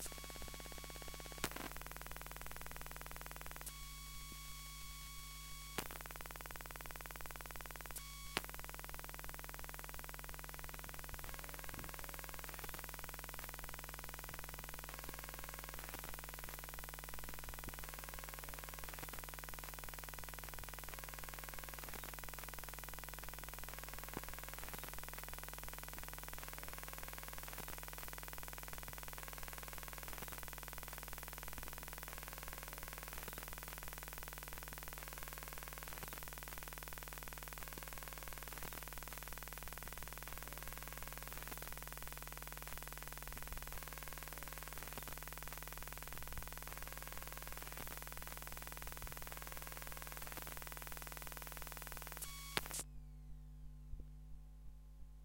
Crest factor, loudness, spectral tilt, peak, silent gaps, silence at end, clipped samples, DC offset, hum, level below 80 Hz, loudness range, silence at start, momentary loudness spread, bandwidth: 36 dB; -49 LUFS; -2.5 dB/octave; -14 dBFS; none; 0 s; under 0.1%; under 0.1%; 60 Hz at -75 dBFS; -56 dBFS; 1 LU; 0 s; 2 LU; 17 kHz